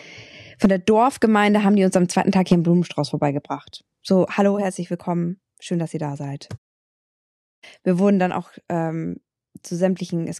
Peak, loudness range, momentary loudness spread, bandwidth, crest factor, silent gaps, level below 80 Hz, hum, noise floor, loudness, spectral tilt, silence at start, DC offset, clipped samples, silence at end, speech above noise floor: -4 dBFS; 8 LU; 15 LU; 12.5 kHz; 16 dB; 6.58-7.62 s; -56 dBFS; none; -43 dBFS; -20 LUFS; -6.5 dB/octave; 0.05 s; under 0.1%; under 0.1%; 0 s; 23 dB